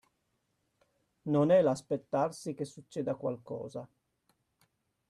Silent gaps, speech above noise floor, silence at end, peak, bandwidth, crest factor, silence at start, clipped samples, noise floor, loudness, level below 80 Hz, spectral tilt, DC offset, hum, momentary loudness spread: none; 48 dB; 1.25 s; -16 dBFS; 12.5 kHz; 18 dB; 1.25 s; under 0.1%; -79 dBFS; -32 LUFS; -76 dBFS; -7 dB/octave; under 0.1%; none; 16 LU